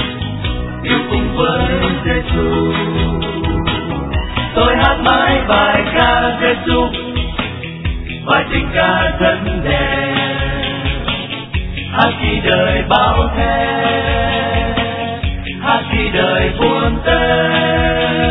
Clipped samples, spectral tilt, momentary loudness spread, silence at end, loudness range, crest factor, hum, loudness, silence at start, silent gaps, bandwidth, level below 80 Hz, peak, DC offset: under 0.1%; -9 dB/octave; 8 LU; 0 s; 3 LU; 14 dB; none; -15 LUFS; 0 s; none; 5.4 kHz; -24 dBFS; 0 dBFS; under 0.1%